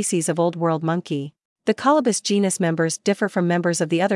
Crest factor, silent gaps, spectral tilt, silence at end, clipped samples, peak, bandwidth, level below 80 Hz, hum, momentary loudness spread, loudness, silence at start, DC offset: 14 dB; 1.45-1.56 s; -5 dB/octave; 0 s; under 0.1%; -6 dBFS; 12 kHz; -76 dBFS; none; 8 LU; -21 LUFS; 0 s; under 0.1%